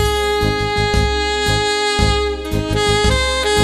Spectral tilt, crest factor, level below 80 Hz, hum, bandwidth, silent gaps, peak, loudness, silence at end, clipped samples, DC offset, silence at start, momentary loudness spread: -4 dB/octave; 14 dB; -24 dBFS; none; 14 kHz; none; -2 dBFS; -16 LUFS; 0 s; under 0.1%; under 0.1%; 0 s; 4 LU